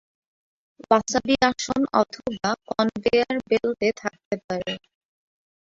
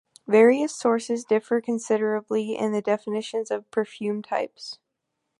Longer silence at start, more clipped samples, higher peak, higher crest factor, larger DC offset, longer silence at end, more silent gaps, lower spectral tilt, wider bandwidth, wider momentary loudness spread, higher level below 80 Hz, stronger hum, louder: first, 0.9 s vs 0.3 s; neither; about the same, -4 dBFS vs -6 dBFS; about the same, 22 dB vs 20 dB; neither; first, 0.9 s vs 0.65 s; first, 4.25-4.31 s, 4.44-4.49 s vs none; about the same, -4 dB/octave vs -5 dB/octave; second, 7.8 kHz vs 11.5 kHz; about the same, 9 LU vs 11 LU; first, -56 dBFS vs -78 dBFS; neither; about the same, -24 LUFS vs -24 LUFS